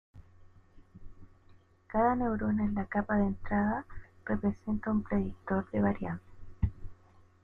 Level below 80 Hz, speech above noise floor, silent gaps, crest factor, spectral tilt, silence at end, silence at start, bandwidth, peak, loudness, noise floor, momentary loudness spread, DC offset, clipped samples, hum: -48 dBFS; 29 dB; none; 18 dB; -11 dB/octave; 0.5 s; 0.15 s; 3.2 kHz; -16 dBFS; -32 LUFS; -60 dBFS; 8 LU; under 0.1%; under 0.1%; none